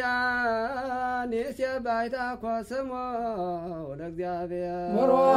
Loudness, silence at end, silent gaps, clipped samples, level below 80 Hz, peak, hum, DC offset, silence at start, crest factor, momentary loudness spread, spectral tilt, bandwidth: -29 LUFS; 0 s; none; under 0.1%; -56 dBFS; -10 dBFS; none; under 0.1%; 0 s; 18 dB; 7 LU; -6 dB/octave; 15 kHz